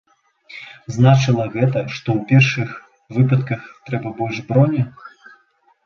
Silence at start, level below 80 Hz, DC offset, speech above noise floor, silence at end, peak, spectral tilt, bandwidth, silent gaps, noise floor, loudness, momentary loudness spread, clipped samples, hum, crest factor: 0.5 s; -54 dBFS; under 0.1%; 42 dB; 0.75 s; -2 dBFS; -7 dB/octave; 7 kHz; none; -59 dBFS; -18 LUFS; 17 LU; under 0.1%; none; 18 dB